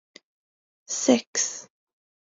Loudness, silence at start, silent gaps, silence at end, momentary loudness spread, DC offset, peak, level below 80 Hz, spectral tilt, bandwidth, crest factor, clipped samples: -24 LUFS; 0.9 s; 1.27-1.33 s; 0.75 s; 11 LU; under 0.1%; -6 dBFS; -80 dBFS; -2 dB/octave; 7.8 kHz; 24 dB; under 0.1%